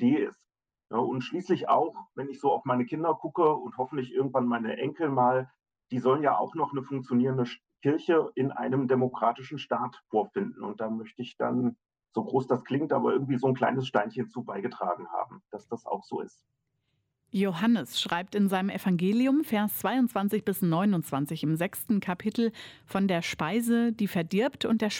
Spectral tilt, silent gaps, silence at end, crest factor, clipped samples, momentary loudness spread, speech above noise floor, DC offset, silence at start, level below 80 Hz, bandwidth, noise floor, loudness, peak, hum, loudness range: -6.5 dB/octave; none; 0 s; 16 dB; under 0.1%; 10 LU; 50 dB; under 0.1%; 0 s; -72 dBFS; 16.5 kHz; -77 dBFS; -29 LUFS; -12 dBFS; none; 5 LU